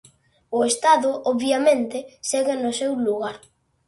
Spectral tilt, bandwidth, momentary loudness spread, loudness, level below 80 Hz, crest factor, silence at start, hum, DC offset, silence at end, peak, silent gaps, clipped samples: -2.5 dB/octave; 11.5 kHz; 10 LU; -22 LUFS; -66 dBFS; 16 dB; 0.5 s; none; under 0.1%; 0.5 s; -6 dBFS; none; under 0.1%